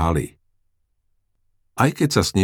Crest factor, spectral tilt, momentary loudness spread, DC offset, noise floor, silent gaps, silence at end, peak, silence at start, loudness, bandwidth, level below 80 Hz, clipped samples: 20 dB; -5 dB/octave; 16 LU; under 0.1%; -68 dBFS; none; 0 s; -2 dBFS; 0 s; -20 LUFS; 18.5 kHz; -38 dBFS; under 0.1%